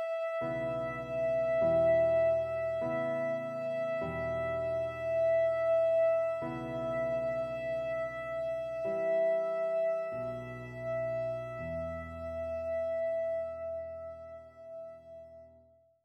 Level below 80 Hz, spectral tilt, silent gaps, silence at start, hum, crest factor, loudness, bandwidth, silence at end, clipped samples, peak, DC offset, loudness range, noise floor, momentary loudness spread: -60 dBFS; -7.5 dB/octave; none; 0 s; none; 12 dB; -33 LUFS; 7.6 kHz; 0.55 s; under 0.1%; -20 dBFS; under 0.1%; 7 LU; -63 dBFS; 15 LU